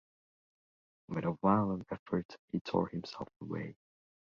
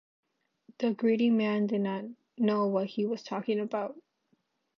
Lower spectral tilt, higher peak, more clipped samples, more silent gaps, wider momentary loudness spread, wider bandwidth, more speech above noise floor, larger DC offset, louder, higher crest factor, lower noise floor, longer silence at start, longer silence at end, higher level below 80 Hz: about the same, -7 dB/octave vs -7.5 dB/octave; about the same, -14 dBFS vs -14 dBFS; neither; first, 1.99-2.06 s, 2.25-2.29 s, 2.39-2.48 s, 2.61-2.65 s, 3.36-3.40 s vs none; first, 13 LU vs 9 LU; about the same, 7 kHz vs 6.4 kHz; first, over 55 dB vs 46 dB; neither; second, -36 LUFS vs -30 LUFS; first, 24 dB vs 16 dB; first, under -90 dBFS vs -74 dBFS; first, 1.1 s vs 0.8 s; second, 0.5 s vs 0.8 s; first, -64 dBFS vs -84 dBFS